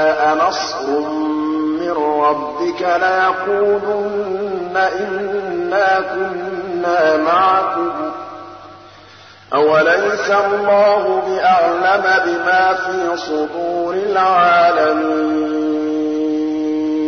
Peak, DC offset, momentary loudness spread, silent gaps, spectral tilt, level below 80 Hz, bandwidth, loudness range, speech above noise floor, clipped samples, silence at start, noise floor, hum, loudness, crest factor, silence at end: -4 dBFS; 0.1%; 8 LU; none; -4.5 dB/octave; -60 dBFS; 6.6 kHz; 4 LU; 26 dB; under 0.1%; 0 s; -41 dBFS; none; -16 LUFS; 12 dB; 0 s